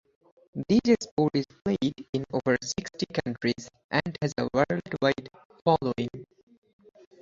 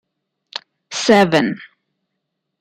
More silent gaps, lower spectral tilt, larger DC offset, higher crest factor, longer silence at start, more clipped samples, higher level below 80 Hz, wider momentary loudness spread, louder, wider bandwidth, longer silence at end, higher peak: first, 1.11-1.17 s, 2.09-2.13 s, 3.84-3.89 s, 5.45-5.50 s vs none; about the same, -5.5 dB/octave vs -4.5 dB/octave; neither; about the same, 22 dB vs 18 dB; second, 0.55 s vs 0.9 s; neither; about the same, -58 dBFS vs -62 dBFS; second, 10 LU vs 19 LU; second, -28 LUFS vs -15 LUFS; second, 7.8 kHz vs 15 kHz; about the same, 0.95 s vs 0.95 s; second, -6 dBFS vs -2 dBFS